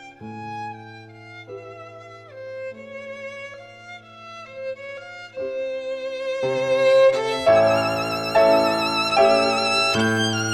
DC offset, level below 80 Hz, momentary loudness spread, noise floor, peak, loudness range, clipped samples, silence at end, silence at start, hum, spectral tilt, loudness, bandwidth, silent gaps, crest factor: under 0.1%; -60 dBFS; 23 LU; -41 dBFS; -6 dBFS; 19 LU; under 0.1%; 0 s; 0 s; 50 Hz at -65 dBFS; -4 dB/octave; -19 LUFS; 15 kHz; none; 16 dB